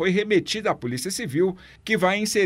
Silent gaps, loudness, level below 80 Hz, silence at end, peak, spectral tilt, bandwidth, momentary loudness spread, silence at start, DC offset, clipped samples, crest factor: none; -23 LUFS; -56 dBFS; 0 s; -6 dBFS; -4.5 dB/octave; 16 kHz; 7 LU; 0 s; under 0.1%; under 0.1%; 16 dB